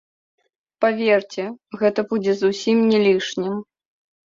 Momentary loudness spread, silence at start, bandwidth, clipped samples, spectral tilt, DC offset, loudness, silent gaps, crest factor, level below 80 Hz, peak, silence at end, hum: 13 LU; 0.8 s; 7.6 kHz; under 0.1%; -5.5 dB/octave; under 0.1%; -20 LUFS; none; 16 dB; -66 dBFS; -4 dBFS; 0.65 s; none